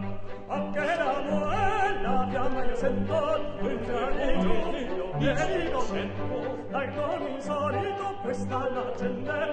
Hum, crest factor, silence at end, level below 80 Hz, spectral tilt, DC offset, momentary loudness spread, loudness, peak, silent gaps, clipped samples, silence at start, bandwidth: none; 16 dB; 0 s; -38 dBFS; -6.5 dB/octave; under 0.1%; 5 LU; -29 LUFS; -10 dBFS; none; under 0.1%; 0 s; 8.8 kHz